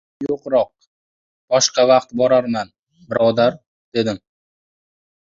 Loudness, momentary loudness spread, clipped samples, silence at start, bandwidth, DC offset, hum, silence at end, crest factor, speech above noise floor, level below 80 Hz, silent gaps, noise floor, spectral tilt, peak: -18 LUFS; 11 LU; under 0.1%; 0.2 s; 7.8 kHz; under 0.1%; none; 1.05 s; 18 dB; over 73 dB; -60 dBFS; 0.87-1.48 s, 2.79-2.87 s, 3.67-3.92 s; under -90 dBFS; -3.5 dB/octave; -2 dBFS